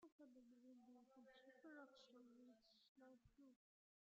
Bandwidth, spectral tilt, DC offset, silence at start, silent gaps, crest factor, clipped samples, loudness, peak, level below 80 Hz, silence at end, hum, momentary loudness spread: 7.2 kHz; -2.5 dB/octave; under 0.1%; 0 s; 0.12-0.19 s, 2.88-2.96 s; 18 dB; under 0.1%; -68 LUFS; -52 dBFS; under -90 dBFS; 0.45 s; none; 5 LU